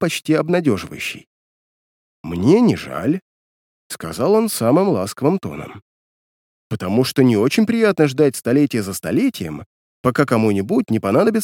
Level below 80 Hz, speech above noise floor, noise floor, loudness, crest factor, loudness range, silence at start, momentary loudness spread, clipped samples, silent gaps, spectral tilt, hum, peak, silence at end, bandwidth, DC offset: -54 dBFS; over 73 dB; under -90 dBFS; -18 LUFS; 18 dB; 3 LU; 0 s; 14 LU; under 0.1%; 1.27-2.24 s, 3.22-3.90 s, 5.82-6.70 s, 9.66-10.04 s; -6 dB/octave; none; 0 dBFS; 0 s; 18.5 kHz; under 0.1%